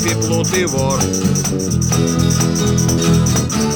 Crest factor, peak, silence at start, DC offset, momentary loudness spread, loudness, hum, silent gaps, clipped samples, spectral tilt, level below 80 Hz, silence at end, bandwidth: 14 dB; -2 dBFS; 0 s; under 0.1%; 3 LU; -15 LUFS; none; none; under 0.1%; -4.5 dB/octave; -32 dBFS; 0 s; 19 kHz